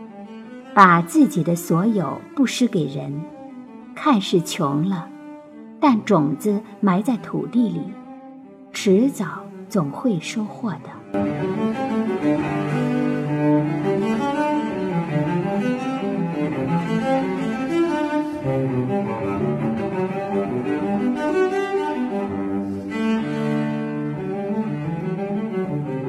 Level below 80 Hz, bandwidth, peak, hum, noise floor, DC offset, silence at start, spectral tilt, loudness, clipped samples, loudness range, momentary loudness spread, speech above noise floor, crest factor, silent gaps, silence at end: -58 dBFS; 14.5 kHz; 0 dBFS; none; -41 dBFS; under 0.1%; 0 s; -6.5 dB/octave; -22 LUFS; under 0.1%; 3 LU; 11 LU; 22 dB; 22 dB; none; 0 s